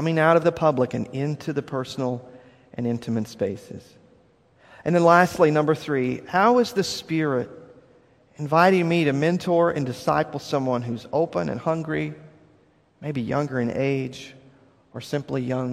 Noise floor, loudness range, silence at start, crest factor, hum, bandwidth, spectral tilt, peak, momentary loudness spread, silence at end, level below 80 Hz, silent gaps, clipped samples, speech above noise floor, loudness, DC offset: -59 dBFS; 8 LU; 0 s; 22 dB; none; 14.5 kHz; -6.5 dB/octave; -2 dBFS; 15 LU; 0 s; -60 dBFS; none; under 0.1%; 37 dB; -23 LUFS; under 0.1%